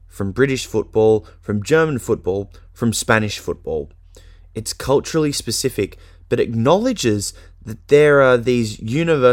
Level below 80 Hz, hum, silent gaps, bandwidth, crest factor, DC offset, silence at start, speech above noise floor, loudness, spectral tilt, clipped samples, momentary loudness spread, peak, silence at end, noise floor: -42 dBFS; none; none; 17 kHz; 18 dB; under 0.1%; 0.15 s; 26 dB; -18 LUFS; -5 dB/octave; under 0.1%; 13 LU; 0 dBFS; 0 s; -43 dBFS